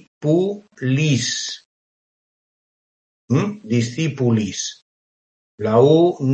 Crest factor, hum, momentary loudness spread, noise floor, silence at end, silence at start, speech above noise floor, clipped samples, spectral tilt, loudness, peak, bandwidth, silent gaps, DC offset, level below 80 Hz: 18 dB; none; 13 LU; under -90 dBFS; 0 s; 0.2 s; over 72 dB; under 0.1%; -5.5 dB/octave; -19 LUFS; -2 dBFS; 8.8 kHz; 1.65-3.28 s, 4.82-5.58 s; under 0.1%; -62 dBFS